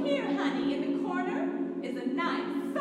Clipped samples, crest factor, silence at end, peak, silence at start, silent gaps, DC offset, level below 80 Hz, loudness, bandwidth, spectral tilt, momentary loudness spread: under 0.1%; 14 dB; 0 s; -16 dBFS; 0 s; none; under 0.1%; -74 dBFS; -31 LUFS; 10.5 kHz; -6 dB/octave; 4 LU